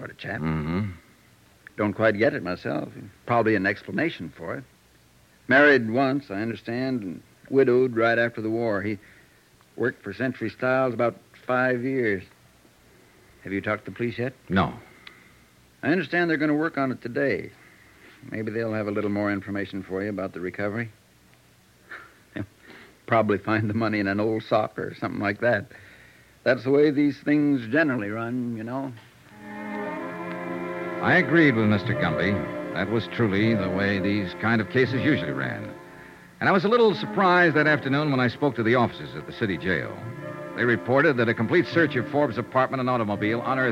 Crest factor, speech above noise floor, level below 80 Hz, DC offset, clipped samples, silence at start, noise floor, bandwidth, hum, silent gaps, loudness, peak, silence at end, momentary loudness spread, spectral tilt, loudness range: 18 dB; 33 dB; -60 dBFS; under 0.1%; under 0.1%; 0 s; -57 dBFS; 15 kHz; none; none; -24 LUFS; -6 dBFS; 0 s; 15 LU; -7.5 dB/octave; 7 LU